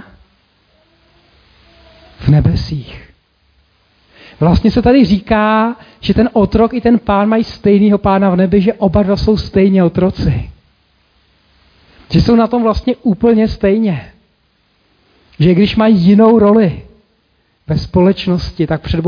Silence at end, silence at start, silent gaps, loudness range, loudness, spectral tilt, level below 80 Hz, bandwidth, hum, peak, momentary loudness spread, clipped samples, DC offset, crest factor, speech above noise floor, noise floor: 0 s; 2.2 s; none; 6 LU; -12 LUFS; -9 dB/octave; -30 dBFS; 5.2 kHz; 50 Hz at -35 dBFS; 0 dBFS; 9 LU; under 0.1%; under 0.1%; 12 dB; 47 dB; -58 dBFS